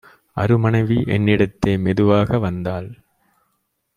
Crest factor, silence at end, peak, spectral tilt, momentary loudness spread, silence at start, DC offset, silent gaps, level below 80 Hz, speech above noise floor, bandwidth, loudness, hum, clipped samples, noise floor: 18 dB; 1.05 s; -2 dBFS; -8.5 dB/octave; 11 LU; 0.35 s; under 0.1%; none; -44 dBFS; 53 dB; 9.8 kHz; -18 LUFS; none; under 0.1%; -70 dBFS